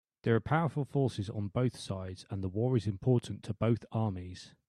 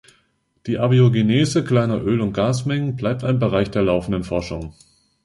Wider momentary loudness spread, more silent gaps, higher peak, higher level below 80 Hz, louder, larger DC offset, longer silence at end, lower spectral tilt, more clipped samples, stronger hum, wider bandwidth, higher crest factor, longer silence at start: about the same, 10 LU vs 11 LU; neither; second, -14 dBFS vs -4 dBFS; second, -62 dBFS vs -44 dBFS; second, -33 LUFS vs -19 LUFS; neither; second, 0.2 s vs 0.55 s; about the same, -7.5 dB/octave vs -7 dB/octave; neither; neither; about the same, 11.5 kHz vs 11.5 kHz; about the same, 18 dB vs 16 dB; second, 0.25 s vs 0.65 s